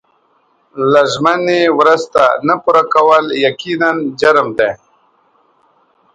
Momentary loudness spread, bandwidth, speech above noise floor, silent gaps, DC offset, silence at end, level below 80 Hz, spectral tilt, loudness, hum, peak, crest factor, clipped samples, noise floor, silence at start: 6 LU; 10.5 kHz; 45 dB; none; under 0.1%; 1.4 s; -56 dBFS; -4.5 dB/octave; -12 LUFS; none; 0 dBFS; 14 dB; under 0.1%; -56 dBFS; 0.75 s